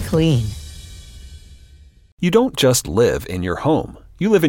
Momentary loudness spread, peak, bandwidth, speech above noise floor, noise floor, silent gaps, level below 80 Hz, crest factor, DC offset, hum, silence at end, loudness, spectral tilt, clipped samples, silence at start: 22 LU; -2 dBFS; 17 kHz; 29 dB; -46 dBFS; 2.12-2.17 s; -38 dBFS; 18 dB; under 0.1%; none; 0 s; -18 LUFS; -5.5 dB/octave; under 0.1%; 0 s